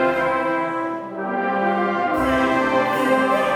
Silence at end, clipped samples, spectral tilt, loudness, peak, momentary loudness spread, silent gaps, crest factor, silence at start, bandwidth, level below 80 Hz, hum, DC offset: 0 s; under 0.1%; -5.5 dB/octave; -20 LUFS; -6 dBFS; 7 LU; none; 14 dB; 0 s; 17.5 kHz; -48 dBFS; none; under 0.1%